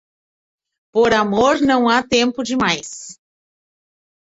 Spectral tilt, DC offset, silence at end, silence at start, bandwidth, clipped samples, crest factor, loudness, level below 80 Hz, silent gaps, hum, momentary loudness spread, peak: -3.5 dB/octave; under 0.1%; 1.1 s; 0.95 s; 8 kHz; under 0.1%; 16 dB; -16 LUFS; -50 dBFS; none; none; 13 LU; -2 dBFS